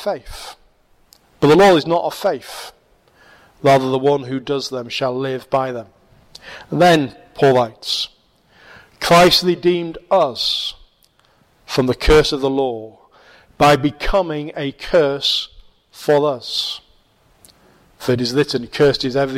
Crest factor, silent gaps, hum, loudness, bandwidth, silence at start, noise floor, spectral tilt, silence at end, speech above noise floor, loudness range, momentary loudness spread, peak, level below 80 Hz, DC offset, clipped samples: 14 dB; none; none; -17 LUFS; 16.5 kHz; 0 s; -57 dBFS; -5 dB/octave; 0 s; 40 dB; 4 LU; 15 LU; -4 dBFS; -36 dBFS; under 0.1%; under 0.1%